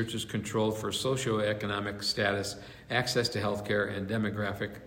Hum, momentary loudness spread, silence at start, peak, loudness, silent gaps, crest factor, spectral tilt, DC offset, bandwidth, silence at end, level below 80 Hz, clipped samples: none; 5 LU; 0 s; -12 dBFS; -31 LUFS; none; 18 dB; -4.5 dB/octave; under 0.1%; 16 kHz; 0 s; -60 dBFS; under 0.1%